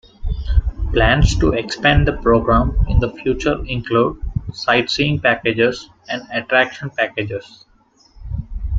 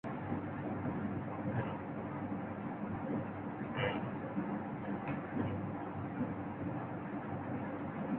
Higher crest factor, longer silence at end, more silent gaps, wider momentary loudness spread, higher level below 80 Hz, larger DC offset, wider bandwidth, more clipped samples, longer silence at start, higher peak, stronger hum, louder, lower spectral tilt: about the same, 16 dB vs 16 dB; about the same, 0 s vs 0 s; neither; first, 13 LU vs 4 LU; first, -24 dBFS vs -62 dBFS; neither; first, 7.8 kHz vs 4.1 kHz; neither; first, 0.2 s vs 0.05 s; first, -2 dBFS vs -22 dBFS; neither; first, -18 LUFS vs -40 LUFS; about the same, -6 dB/octave vs -6.5 dB/octave